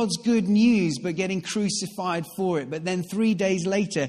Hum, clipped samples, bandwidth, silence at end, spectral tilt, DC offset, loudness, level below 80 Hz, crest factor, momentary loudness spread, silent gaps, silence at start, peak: none; under 0.1%; 14.5 kHz; 0 s; -5 dB/octave; under 0.1%; -24 LUFS; -62 dBFS; 14 dB; 9 LU; none; 0 s; -10 dBFS